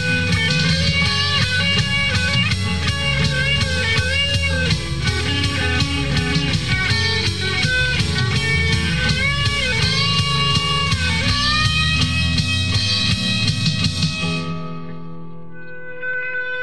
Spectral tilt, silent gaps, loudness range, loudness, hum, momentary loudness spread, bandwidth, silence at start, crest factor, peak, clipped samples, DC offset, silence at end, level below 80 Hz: -4 dB/octave; none; 3 LU; -17 LUFS; none; 8 LU; 12.5 kHz; 0 s; 14 dB; -4 dBFS; under 0.1%; 2%; 0 s; -32 dBFS